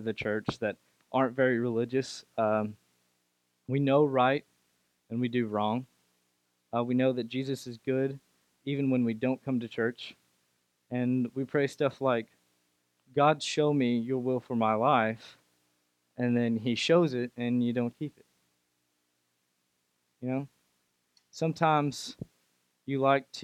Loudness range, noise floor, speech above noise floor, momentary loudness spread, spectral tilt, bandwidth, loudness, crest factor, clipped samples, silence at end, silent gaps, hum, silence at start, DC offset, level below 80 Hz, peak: 5 LU; -77 dBFS; 48 dB; 15 LU; -6.5 dB/octave; 12.5 kHz; -30 LUFS; 20 dB; under 0.1%; 0 s; none; 60 Hz at -60 dBFS; 0 s; under 0.1%; -74 dBFS; -10 dBFS